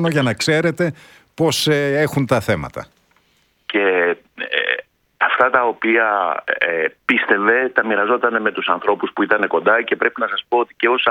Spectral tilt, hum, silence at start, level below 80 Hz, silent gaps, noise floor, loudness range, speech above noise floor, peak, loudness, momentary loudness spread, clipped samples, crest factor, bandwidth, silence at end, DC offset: -4.5 dB/octave; none; 0 s; -54 dBFS; none; -61 dBFS; 4 LU; 43 dB; 0 dBFS; -17 LUFS; 7 LU; under 0.1%; 18 dB; 18 kHz; 0 s; under 0.1%